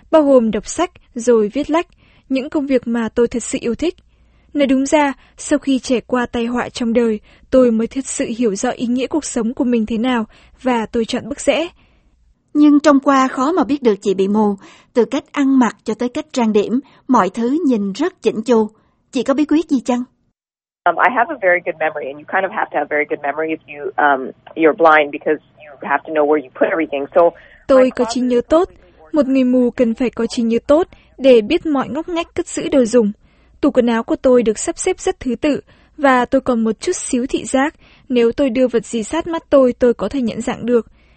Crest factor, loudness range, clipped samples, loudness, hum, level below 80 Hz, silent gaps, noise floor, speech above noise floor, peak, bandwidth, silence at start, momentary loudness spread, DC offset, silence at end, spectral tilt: 16 dB; 3 LU; under 0.1%; -17 LUFS; none; -46 dBFS; none; under -90 dBFS; over 74 dB; 0 dBFS; 8.8 kHz; 0.1 s; 9 LU; under 0.1%; 0.35 s; -4.5 dB/octave